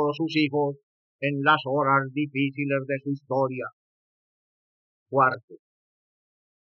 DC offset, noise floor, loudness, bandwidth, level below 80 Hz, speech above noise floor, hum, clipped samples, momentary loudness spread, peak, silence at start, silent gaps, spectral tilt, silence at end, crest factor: under 0.1%; under -90 dBFS; -25 LUFS; 6.6 kHz; under -90 dBFS; over 65 dB; none; under 0.1%; 9 LU; -8 dBFS; 0 s; 0.83-1.19 s, 3.73-5.06 s, 5.43-5.48 s; -4.5 dB/octave; 1.15 s; 20 dB